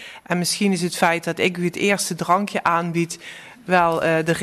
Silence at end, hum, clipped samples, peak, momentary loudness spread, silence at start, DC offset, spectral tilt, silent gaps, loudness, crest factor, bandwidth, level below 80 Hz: 0 s; none; under 0.1%; -4 dBFS; 7 LU; 0 s; under 0.1%; -4.5 dB/octave; none; -20 LUFS; 16 dB; 13.5 kHz; -58 dBFS